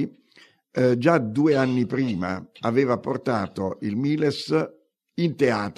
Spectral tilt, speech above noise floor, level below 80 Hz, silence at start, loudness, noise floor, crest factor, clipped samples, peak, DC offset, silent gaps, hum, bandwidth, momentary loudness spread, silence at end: -7 dB/octave; 33 dB; -66 dBFS; 0 s; -24 LUFS; -56 dBFS; 18 dB; under 0.1%; -6 dBFS; under 0.1%; none; none; 12 kHz; 9 LU; 0.05 s